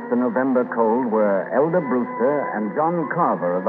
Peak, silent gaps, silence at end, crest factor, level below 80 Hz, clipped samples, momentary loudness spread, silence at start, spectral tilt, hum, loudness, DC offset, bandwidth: -6 dBFS; none; 0 s; 14 dB; -74 dBFS; under 0.1%; 3 LU; 0 s; -11.5 dB/octave; none; -21 LUFS; under 0.1%; 3.6 kHz